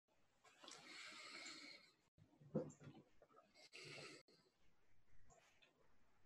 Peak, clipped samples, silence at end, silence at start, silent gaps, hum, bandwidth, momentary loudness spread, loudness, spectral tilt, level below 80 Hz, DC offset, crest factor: -32 dBFS; under 0.1%; 0 s; 0.1 s; 2.08-2.18 s, 4.21-4.28 s; none; 12 kHz; 15 LU; -56 LUFS; -4 dB/octave; -86 dBFS; under 0.1%; 28 dB